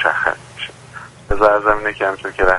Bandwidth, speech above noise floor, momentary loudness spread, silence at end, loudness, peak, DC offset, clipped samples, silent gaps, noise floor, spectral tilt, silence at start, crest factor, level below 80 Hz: 11.5 kHz; 21 dB; 21 LU; 0 s; -17 LUFS; 0 dBFS; under 0.1%; under 0.1%; none; -37 dBFS; -5 dB/octave; 0 s; 18 dB; -32 dBFS